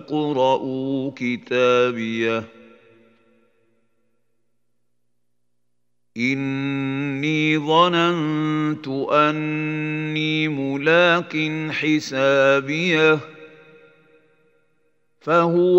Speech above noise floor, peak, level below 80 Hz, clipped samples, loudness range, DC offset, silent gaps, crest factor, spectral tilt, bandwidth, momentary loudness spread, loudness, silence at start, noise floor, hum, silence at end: 58 dB; -2 dBFS; -74 dBFS; under 0.1%; 10 LU; under 0.1%; none; 20 dB; -6 dB/octave; 8 kHz; 8 LU; -20 LUFS; 0 s; -78 dBFS; 60 Hz at -60 dBFS; 0 s